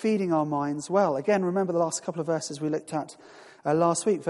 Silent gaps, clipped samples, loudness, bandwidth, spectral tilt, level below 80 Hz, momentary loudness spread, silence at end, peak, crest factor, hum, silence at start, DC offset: none; under 0.1%; -27 LUFS; 11.5 kHz; -5.5 dB/octave; -74 dBFS; 8 LU; 0 s; -10 dBFS; 16 dB; none; 0 s; under 0.1%